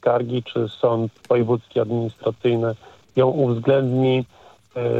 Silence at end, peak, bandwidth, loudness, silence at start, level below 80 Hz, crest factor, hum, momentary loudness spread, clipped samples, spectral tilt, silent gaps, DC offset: 0 s; -6 dBFS; 7.6 kHz; -21 LUFS; 0.05 s; -64 dBFS; 16 dB; none; 8 LU; under 0.1%; -9 dB/octave; none; under 0.1%